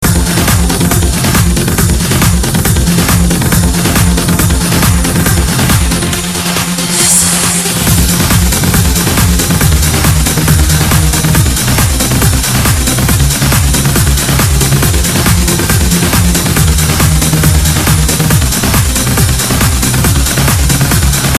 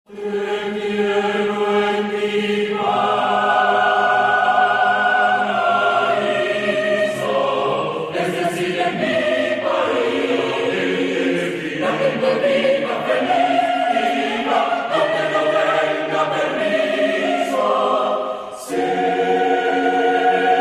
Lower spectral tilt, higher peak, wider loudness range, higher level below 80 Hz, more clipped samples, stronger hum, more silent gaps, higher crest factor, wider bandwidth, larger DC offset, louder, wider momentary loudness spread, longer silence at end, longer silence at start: about the same, -4 dB/octave vs -4.5 dB/octave; about the same, 0 dBFS vs -2 dBFS; about the same, 1 LU vs 3 LU; first, -16 dBFS vs -62 dBFS; first, 0.4% vs under 0.1%; neither; neither; second, 8 dB vs 16 dB; about the same, 14.5 kHz vs 14.5 kHz; neither; first, -9 LUFS vs -18 LUFS; second, 1 LU vs 6 LU; about the same, 0 s vs 0 s; about the same, 0 s vs 0.1 s